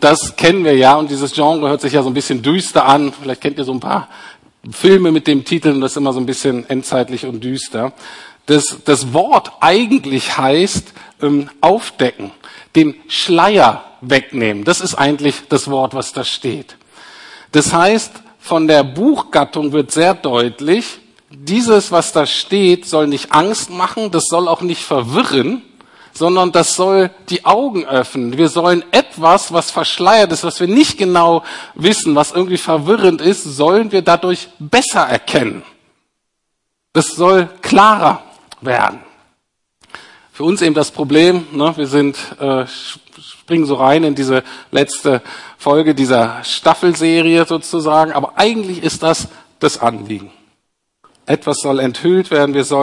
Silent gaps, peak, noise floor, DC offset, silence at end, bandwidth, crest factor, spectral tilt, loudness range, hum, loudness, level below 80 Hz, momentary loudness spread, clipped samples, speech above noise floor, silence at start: none; 0 dBFS; -71 dBFS; under 0.1%; 0 s; 11.5 kHz; 14 dB; -4.5 dB/octave; 4 LU; none; -13 LUFS; -54 dBFS; 10 LU; 0.1%; 58 dB; 0 s